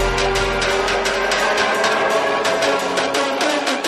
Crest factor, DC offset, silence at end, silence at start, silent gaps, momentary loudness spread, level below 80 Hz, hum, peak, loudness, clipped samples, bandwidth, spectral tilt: 14 dB; under 0.1%; 0 s; 0 s; none; 2 LU; -34 dBFS; none; -4 dBFS; -17 LUFS; under 0.1%; 15.5 kHz; -2.5 dB/octave